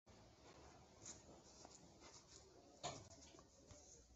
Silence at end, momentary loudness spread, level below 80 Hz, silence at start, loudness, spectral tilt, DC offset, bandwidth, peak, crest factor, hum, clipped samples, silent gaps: 0 s; 13 LU; -74 dBFS; 0.05 s; -60 LUFS; -3.5 dB/octave; under 0.1%; 8 kHz; -36 dBFS; 26 dB; none; under 0.1%; none